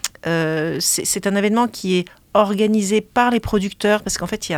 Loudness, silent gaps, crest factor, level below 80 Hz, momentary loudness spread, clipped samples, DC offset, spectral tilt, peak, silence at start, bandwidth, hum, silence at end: -19 LUFS; none; 18 dB; -44 dBFS; 5 LU; under 0.1%; under 0.1%; -4 dB/octave; 0 dBFS; 0.05 s; 17.5 kHz; none; 0 s